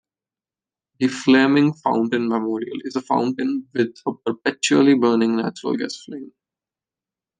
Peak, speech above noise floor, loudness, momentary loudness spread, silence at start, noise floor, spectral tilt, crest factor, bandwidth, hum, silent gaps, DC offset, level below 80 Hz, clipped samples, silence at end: -2 dBFS; over 70 dB; -20 LUFS; 12 LU; 1 s; under -90 dBFS; -5 dB/octave; 18 dB; 9.6 kHz; none; none; under 0.1%; -72 dBFS; under 0.1%; 1.1 s